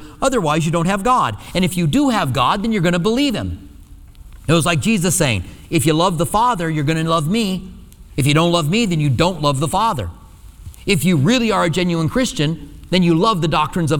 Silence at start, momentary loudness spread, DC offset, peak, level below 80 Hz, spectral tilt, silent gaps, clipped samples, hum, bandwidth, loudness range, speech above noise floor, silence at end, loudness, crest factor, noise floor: 0 s; 7 LU; under 0.1%; 0 dBFS; -38 dBFS; -5 dB/octave; none; under 0.1%; none; 19 kHz; 2 LU; 23 dB; 0 s; -17 LUFS; 16 dB; -40 dBFS